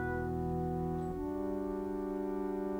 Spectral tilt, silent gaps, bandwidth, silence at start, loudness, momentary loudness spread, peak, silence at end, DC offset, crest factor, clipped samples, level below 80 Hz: -9 dB/octave; none; 16.5 kHz; 0 s; -37 LUFS; 2 LU; -24 dBFS; 0 s; under 0.1%; 12 dB; under 0.1%; -50 dBFS